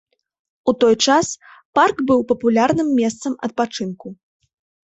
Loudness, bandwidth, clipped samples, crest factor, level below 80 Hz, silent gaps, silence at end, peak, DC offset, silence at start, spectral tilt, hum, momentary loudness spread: -18 LUFS; 8.2 kHz; under 0.1%; 18 dB; -58 dBFS; 1.65-1.73 s; 0.7 s; -2 dBFS; under 0.1%; 0.65 s; -4 dB/octave; none; 13 LU